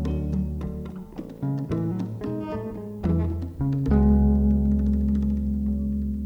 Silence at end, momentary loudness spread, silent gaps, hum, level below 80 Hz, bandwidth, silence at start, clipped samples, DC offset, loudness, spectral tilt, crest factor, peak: 0 s; 13 LU; none; none; -28 dBFS; 5.6 kHz; 0 s; under 0.1%; under 0.1%; -25 LUFS; -10.5 dB/octave; 14 dB; -10 dBFS